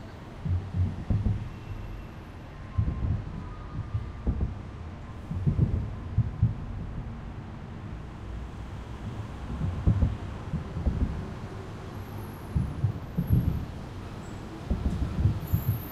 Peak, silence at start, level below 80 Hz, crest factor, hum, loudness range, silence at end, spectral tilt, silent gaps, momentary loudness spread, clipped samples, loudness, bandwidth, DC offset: -10 dBFS; 0 s; -36 dBFS; 20 dB; none; 4 LU; 0 s; -8.5 dB/octave; none; 13 LU; under 0.1%; -32 LUFS; 14.5 kHz; under 0.1%